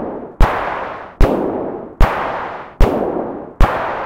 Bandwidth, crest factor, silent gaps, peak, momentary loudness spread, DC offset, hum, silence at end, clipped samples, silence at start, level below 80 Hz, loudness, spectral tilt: 15 kHz; 16 dB; none; 0 dBFS; 10 LU; 2%; none; 0 s; 0.9%; 0 s; -18 dBFS; -19 LUFS; -7 dB/octave